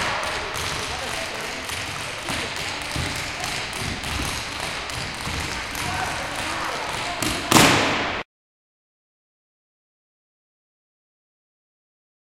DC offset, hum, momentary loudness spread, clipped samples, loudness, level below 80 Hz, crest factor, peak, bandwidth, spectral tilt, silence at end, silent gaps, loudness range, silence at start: under 0.1%; none; 10 LU; under 0.1%; -24 LUFS; -44 dBFS; 26 dB; 0 dBFS; 17 kHz; -2.5 dB/octave; 4 s; none; 5 LU; 0 s